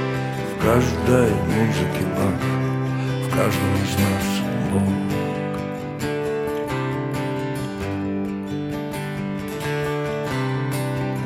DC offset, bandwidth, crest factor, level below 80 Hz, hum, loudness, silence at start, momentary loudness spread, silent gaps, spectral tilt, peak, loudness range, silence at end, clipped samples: under 0.1%; 16.5 kHz; 18 dB; -44 dBFS; none; -23 LUFS; 0 s; 8 LU; none; -6.5 dB/octave; -4 dBFS; 5 LU; 0 s; under 0.1%